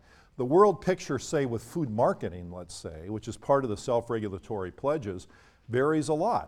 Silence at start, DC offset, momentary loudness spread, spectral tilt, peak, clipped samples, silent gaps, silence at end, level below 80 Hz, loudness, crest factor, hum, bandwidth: 0.4 s; under 0.1%; 16 LU; -6.5 dB/octave; -8 dBFS; under 0.1%; none; 0 s; -56 dBFS; -29 LUFS; 20 dB; none; 14 kHz